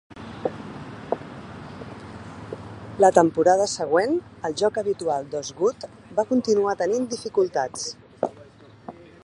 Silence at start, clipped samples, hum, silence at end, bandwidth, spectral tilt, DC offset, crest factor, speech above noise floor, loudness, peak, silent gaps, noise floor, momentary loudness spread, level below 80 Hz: 0.15 s; under 0.1%; none; 0.3 s; 11 kHz; -4.5 dB/octave; under 0.1%; 24 dB; 26 dB; -23 LUFS; 0 dBFS; none; -48 dBFS; 21 LU; -58 dBFS